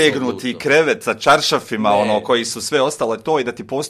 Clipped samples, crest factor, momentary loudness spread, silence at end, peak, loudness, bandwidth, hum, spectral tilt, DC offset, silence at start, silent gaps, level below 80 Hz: under 0.1%; 16 dB; 7 LU; 0 s; 0 dBFS; -17 LUFS; 14.5 kHz; none; -3.5 dB/octave; under 0.1%; 0 s; none; -58 dBFS